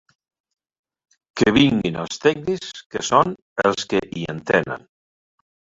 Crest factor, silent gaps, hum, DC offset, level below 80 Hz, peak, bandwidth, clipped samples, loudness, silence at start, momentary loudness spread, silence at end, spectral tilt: 22 dB; 2.86-2.90 s, 3.42-3.56 s; none; under 0.1%; -52 dBFS; 0 dBFS; 8 kHz; under 0.1%; -20 LUFS; 1.35 s; 13 LU; 1 s; -5 dB/octave